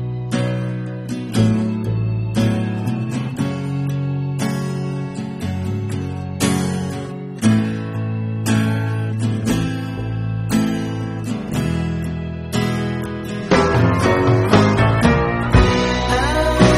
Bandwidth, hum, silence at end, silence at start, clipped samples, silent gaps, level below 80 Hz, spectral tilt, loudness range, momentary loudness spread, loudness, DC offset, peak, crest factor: 14 kHz; none; 0 s; 0 s; under 0.1%; none; -32 dBFS; -6.5 dB/octave; 7 LU; 10 LU; -19 LUFS; under 0.1%; 0 dBFS; 18 dB